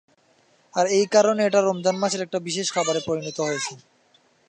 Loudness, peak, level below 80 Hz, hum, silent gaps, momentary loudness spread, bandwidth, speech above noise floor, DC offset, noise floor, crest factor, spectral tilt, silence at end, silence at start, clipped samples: -22 LUFS; -6 dBFS; -70 dBFS; none; none; 9 LU; 9.8 kHz; 39 dB; under 0.1%; -61 dBFS; 18 dB; -3.5 dB/octave; 0.7 s; 0.75 s; under 0.1%